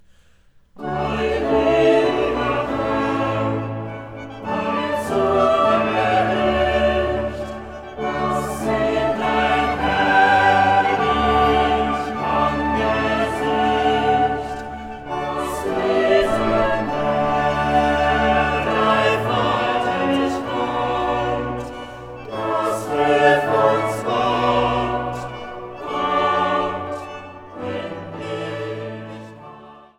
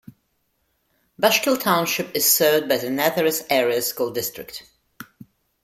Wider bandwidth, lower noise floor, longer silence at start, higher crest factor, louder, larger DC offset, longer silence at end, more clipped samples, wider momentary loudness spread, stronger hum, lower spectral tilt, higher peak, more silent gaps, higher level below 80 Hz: about the same, 15.5 kHz vs 16.5 kHz; second, -52 dBFS vs -70 dBFS; second, 0.75 s vs 1.2 s; about the same, 18 dB vs 20 dB; about the same, -19 LUFS vs -20 LUFS; neither; second, 0.2 s vs 0.6 s; neither; first, 15 LU vs 12 LU; neither; first, -5.5 dB/octave vs -2.5 dB/octave; about the same, -2 dBFS vs -2 dBFS; neither; first, -38 dBFS vs -64 dBFS